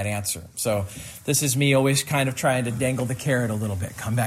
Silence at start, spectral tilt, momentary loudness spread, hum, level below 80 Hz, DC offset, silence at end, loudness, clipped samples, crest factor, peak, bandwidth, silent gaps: 0 s; -4.5 dB/octave; 9 LU; none; -56 dBFS; under 0.1%; 0 s; -23 LUFS; under 0.1%; 16 dB; -8 dBFS; 16 kHz; none